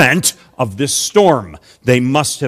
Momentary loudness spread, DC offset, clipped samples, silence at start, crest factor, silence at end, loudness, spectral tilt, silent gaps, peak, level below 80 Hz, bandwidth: 11 LU; under 0.1%; 0.4%; 0 s; 14 dB; 0 s; -14 LUFS; -4 dB/octave; none; 0 dBFS; -48 dBFS; 15.5 kHz